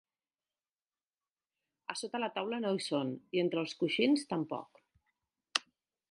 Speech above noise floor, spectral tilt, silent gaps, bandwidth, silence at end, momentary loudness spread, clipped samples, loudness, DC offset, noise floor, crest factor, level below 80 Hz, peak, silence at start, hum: over 56 dB; -4.5 dB/octave; none; 11.5 kHz; 0.5 s; 11 LU; under 0.1%; -35 LUFS; under 0.1%; under -90 dBFS; 30 dB; -84 dBFS; -8 dBFS; 1.9 s; none